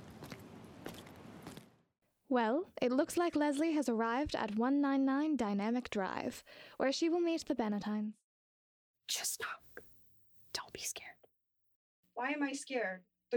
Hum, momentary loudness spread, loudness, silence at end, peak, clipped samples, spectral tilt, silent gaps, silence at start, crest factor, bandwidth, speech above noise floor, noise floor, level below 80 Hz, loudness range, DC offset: none; 19 LU; -36 LUFS; 0 s; -18 dBFS; under 0.1%; -4 dB/octave; 8.24-8.94 s, 11.76-12.03 s; 0 s; 18 dB; over 20 kHz; 43 dB; -79 dBFS; -68 dBFS; 9 LU; under 0.1%